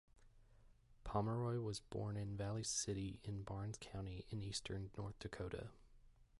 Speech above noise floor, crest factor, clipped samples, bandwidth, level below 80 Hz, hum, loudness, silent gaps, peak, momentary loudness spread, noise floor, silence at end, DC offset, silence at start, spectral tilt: 22 dB; 20 dB; under 0.1%; 11.5 kHz; -62 dBFS; none; -46 LUFS; none; -26 dBFS; 9 LU; -68 dBFS; 0 s; under 0.1%; 0.15 s; -5 dB/octave